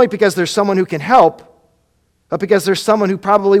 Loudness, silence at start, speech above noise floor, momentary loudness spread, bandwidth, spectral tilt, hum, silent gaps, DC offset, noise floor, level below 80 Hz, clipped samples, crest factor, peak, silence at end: -14 LUFS; 0 s; 47 dB; 6 LU; 15.5 kHz; -5 dB/octave; none; none; under 0.1%; -61 dBFS; -54 dBFS; 0.1%; 14 dB; 0 dBFS; 0 s